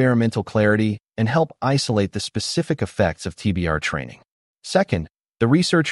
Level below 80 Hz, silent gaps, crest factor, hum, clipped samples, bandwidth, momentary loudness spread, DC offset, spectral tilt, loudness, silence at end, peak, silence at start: -44 dBFS; 4.31-4.55 s; 16 dB; none; under 0.1%; 11.5 kHz; 8 LU; under 0.1%; -5.5 dB/octave; -21 LUFS; 0 s; -4 dBFS; 0 s